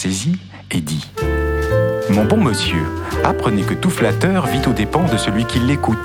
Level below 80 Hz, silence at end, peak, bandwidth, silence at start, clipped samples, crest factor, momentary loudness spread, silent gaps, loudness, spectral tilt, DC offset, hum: -30 dBFS; 0 s; 0 dBFS; 18 kHz; 0 s; under 0.1%; 16 dB; 7 LU; none; -17 LUFS; -5.5 dB/octave; under 0.1%; none